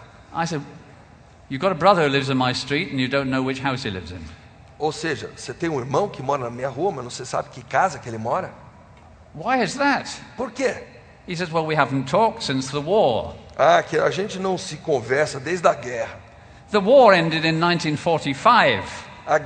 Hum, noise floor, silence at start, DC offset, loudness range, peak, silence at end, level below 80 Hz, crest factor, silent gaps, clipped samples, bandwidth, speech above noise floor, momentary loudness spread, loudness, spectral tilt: none; -48 dBFS; 0 s; under 0.1%; 8 LU; 0 dBFS; 0 s; -52 dBFS; 22 dB; none; under 0.1%; 9.4 kHz; 27 dB; 15 LU; -21 LUFS; -5 dB/octave